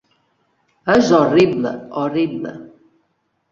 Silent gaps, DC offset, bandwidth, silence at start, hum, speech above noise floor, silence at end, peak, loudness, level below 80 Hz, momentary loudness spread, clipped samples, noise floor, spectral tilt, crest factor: none; under 0.1%; 7.6 kHz; 0.85 s; none; 52 dB; 0.85 s; -2 dBFS; -17 LUFS; -56 dBFS; 16 LU; under 0.1%; -68 dBFS; -6 dB/octave; 18 dB